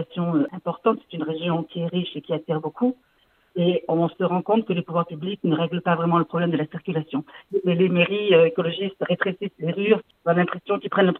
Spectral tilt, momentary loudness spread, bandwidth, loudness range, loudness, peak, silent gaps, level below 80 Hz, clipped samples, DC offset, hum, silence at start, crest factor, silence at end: -10 dB/octave; 9 LU; 4.1 kHz; 4 LU; -23 LUFS; -4 dBFS; none; -72 dBFS; under 0.1%; under 0.1%; none; 0 s; 18 dB; 0 s